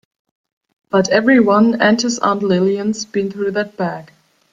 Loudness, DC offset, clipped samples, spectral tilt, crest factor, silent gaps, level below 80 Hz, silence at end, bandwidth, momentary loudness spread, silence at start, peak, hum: -15 LUFS; under 0.1%; under 0.1%; -5 dB/octave; 16 dB; none; -60 dBFS; 0.45 s; 7.8 kHz; 10 LU; 0.95 s; 0 dBFS; none